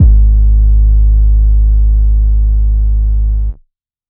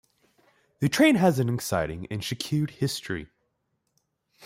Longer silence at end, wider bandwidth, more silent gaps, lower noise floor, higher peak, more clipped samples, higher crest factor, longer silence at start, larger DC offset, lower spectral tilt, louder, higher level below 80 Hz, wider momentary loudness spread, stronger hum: first, 0.55 s vs 0 s; second, 0.8 kHz vs 16 kHz; neither; second, -52 dBFS vs -76 dBFS; first, 0 dBFS vs -8 dBFS; first, 0.2% vs under 0.1%; second, 8 dB vs 20 dB; second, 0 s vs 0.8 s; neither; first, -14.5 dB/octave vs -5.5 dB/octave; first, -12 LUFS vs -26 LUFS; first, -8 dBFS vs -56 dBFS; second, 5 LU vs 13 LU; first, 50 Hz at -50 dBFS vs none